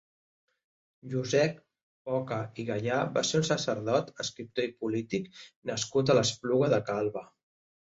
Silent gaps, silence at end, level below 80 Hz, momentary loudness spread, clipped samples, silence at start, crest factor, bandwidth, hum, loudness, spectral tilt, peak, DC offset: 1.82-2.05 s, 5.56-5.62 s; 0.6 s; -66 dBFS; 11 LU; under 0.1%; 1.05 s; 20 dB; 8 kHz; none; -30 LUFS; -4.5 dB/octave; -12 dBFS; under 0.1%